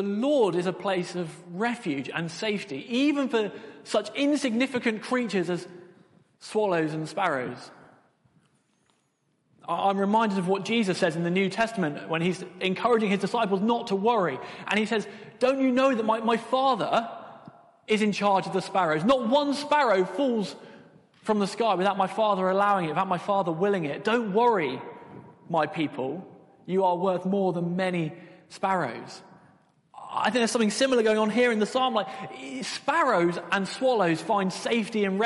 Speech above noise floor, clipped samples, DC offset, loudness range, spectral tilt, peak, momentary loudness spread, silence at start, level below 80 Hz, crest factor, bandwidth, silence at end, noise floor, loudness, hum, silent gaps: 46 dB; under 0.1%; under 0.1%; 5 LU; -5.5 dB/octave; -12 dBFS; 11 LU; 0 s; -70 dBFS; 14 dB; 11.5 kHz; 0 s; -71 dBFS; -26 LUFS; none; none